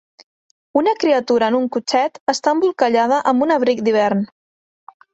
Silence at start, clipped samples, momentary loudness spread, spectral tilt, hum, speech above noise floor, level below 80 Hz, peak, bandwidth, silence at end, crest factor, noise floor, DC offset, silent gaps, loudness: 0.75 s; under 0.1%; 4 LU; -4.5 dB/octave; none; over 74 dB; -64 dBFS; -2 dBFS; 8.2 kHz; 0.9 s; 16 dB; under -90 dBFS; under 0.1%; 2.20-2.27 s; -17 LUFS